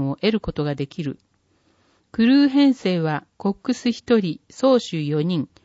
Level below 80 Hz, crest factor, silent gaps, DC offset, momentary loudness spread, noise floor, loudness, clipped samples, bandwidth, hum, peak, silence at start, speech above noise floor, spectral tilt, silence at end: -52 dBFS; 14 dB; none; under 0.1%; 13 LU; -63 dBFS; -21 LUFS; under 0.1%; 8 kHz; none; -6 dBFS; 0 s; 42 dB; -6.5 dB/octave; 0.2 s